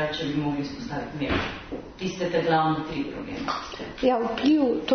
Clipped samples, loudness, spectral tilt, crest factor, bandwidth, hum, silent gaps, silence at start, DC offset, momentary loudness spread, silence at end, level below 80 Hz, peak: under 0.1%; -26 LUFS; -6 dB/octave; 18 dB; 6.6 kHz; none; none; 0 s; under 0.1%; 11 LU; 0 s; -48 dBFS; -8 dBFS